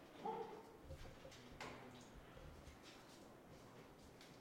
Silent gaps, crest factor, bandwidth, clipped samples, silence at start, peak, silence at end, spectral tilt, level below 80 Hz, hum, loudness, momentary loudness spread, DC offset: none; 20 dB; 16 kHz; under 0.1%; 0 s; -36 dBFS; 0 s; -5 dB/octave; -68 dBFS; none; -57 LUFS; 12 LU; under 0.1%